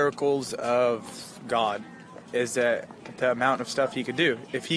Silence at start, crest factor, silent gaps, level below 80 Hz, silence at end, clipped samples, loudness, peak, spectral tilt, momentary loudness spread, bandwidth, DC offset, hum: 0 s; 18 dB; none; -70 dBFS; 0 s; under 0.1%; -27 LUFS; -8 dBFS; -4 dB/octave; 14 LU; 11 kHz; under 0.1%; none